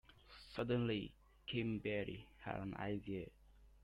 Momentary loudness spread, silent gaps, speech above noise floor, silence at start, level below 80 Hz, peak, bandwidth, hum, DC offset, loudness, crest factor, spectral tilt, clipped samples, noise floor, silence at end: 15 LU; none; 19 dB; 0.1 s; -64 dBFS; -24 dBFS; 11 kHz; none; under 0.1%; -44 LUFS; 20 dB; -8 dB/octave; under 0.1%; -62 dBFS; 0.05 s